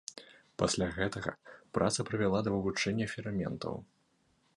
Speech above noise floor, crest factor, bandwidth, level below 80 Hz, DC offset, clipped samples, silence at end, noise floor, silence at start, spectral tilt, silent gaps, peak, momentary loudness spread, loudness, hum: 39 dB; 20 dB; 11.5 kHz; -56 dBFS; under 0.1%; under 0.1%; 0.75 s; -72 dBFS; 0.1 s; -4.5 dB/octave; none; -14 dBFS; 15 LU; -34 LUFS; none